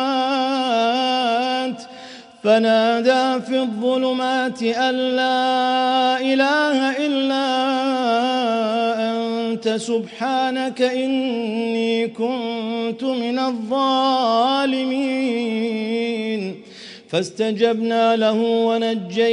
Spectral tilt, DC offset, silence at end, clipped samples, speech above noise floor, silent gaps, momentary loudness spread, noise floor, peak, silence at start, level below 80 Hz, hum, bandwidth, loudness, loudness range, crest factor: -4.5 dB/octave; under 0.1%; 0 s; under 0.1%; 21 dB; none; 7 LU; -40 dBFS; -4 dBFS; 0 s; -76 dBFS; none; 10.5 kHz; -20 LUFS; 3 LU; 16 dB